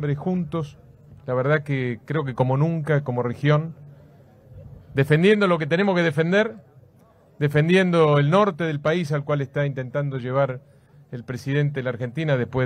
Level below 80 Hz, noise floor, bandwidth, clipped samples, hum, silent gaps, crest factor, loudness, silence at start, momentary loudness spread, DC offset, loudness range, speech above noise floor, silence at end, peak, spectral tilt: -58 dBFS; -54 dBFS; 10 kHz; under 0.1%; none; none; 16 dB; -22 LUFS; 0 s; 11 LU; under 0.1%; 5 LU; 33 dB; 0 s; -6 dBFS; -7.5 dB/octave